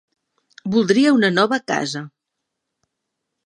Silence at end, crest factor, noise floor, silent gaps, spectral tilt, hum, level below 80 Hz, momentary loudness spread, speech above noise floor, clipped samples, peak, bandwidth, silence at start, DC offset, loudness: 1.35 s; 18 dB; -80 dBFS; none; -5 dB/octave; none; -68 dBFS; 14 LU; 62 dB; under 0.1%; -2 dBFS; 10 kHz; 0.65 s; under 0.1%; -18 LUFS